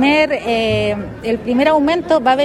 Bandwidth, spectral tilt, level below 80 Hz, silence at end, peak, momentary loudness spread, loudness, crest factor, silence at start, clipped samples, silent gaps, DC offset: 13 kHz; -5.5 dB/octave; -42 dBFS; 0 s; -2 dBFS; 8 LU; -16 LUFS; 14 dB; 0 s; under 0.1%; none; under 0.1%